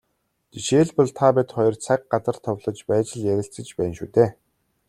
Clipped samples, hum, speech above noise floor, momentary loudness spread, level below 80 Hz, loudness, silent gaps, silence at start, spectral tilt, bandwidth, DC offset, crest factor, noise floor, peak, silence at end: under 0.1%; none; 51 dB; 9 LU; -58 dBFS; -22 LUFS; none; 0.55 s; -6 dB/octave; 13 kHz; under 0.1%; 20 dB; -72 dBFS; -2 dBFS; 0.55 s